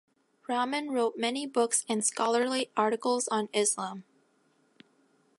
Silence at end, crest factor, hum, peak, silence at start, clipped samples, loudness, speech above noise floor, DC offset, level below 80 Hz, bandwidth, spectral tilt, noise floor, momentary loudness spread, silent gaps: 1.4 s; 18 dB; none; -12 dBFS; 0.5 s; under 0.1%; -29 LUFS; 40 dB; under 0.1%; -86 dBFS; 12 kHz; -2 dB/octave; -69 dBFS; 7 LU; none